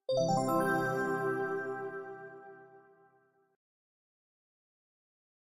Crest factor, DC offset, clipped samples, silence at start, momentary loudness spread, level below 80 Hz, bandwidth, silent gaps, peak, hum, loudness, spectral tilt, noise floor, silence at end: 18 dB; under 0.1%; under 0.1%; 0.1 s; 19 LU; -74 dBFS; 15 kHz; none; -18 dBFS; none; -33 LUFS; -5.5 dB/octave; -69 dBFS; 2.7 s